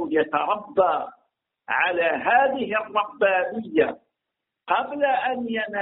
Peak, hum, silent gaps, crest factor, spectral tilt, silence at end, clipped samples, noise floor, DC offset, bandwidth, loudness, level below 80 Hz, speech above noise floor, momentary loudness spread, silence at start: -6 dBFS; none; none; 18 dB; -1.5 dB/octave; 0 s; under 0.1%; -84 dBFS; under 0.1%; 4 kHz; -23 LUFS; -66 dBFS; 61 dB; 7 LU; 0 s